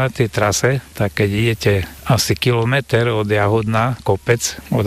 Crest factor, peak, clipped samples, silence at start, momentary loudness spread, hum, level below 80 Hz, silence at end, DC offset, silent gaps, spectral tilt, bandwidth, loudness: 14 dB; -2 dBFS; under 0.1%; 0 s; 4 LU; none; -42 dBFS; 0 s; under 0.1%; none; -5 dB/octave; 15.5 kHz; -17 LUFS